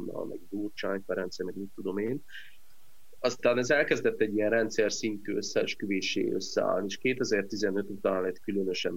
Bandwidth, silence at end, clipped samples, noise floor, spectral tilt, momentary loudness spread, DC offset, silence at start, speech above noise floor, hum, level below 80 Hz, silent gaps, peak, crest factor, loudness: 16 kHz; 0 s; under 0.1%; -64 dBFS; -4 dB/octave; 11 LU; 0.8%; 0 s; 34 dB; none; -68 dBFS; none; -10 dBFS; 20 dB; -30 LUFS